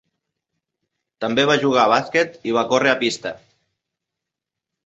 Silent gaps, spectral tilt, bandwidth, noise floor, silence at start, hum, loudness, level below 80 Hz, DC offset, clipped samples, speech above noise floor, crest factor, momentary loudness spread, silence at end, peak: none; -4 dB/octave; 8.2 kHz; -84 dBFS; 1.2 s; none; -18 LUFS; -64 dBFS; under 0.1%; under 0.1%; 66 dB; 20 dB; 11 LU; 1.5 s; -2 dBFS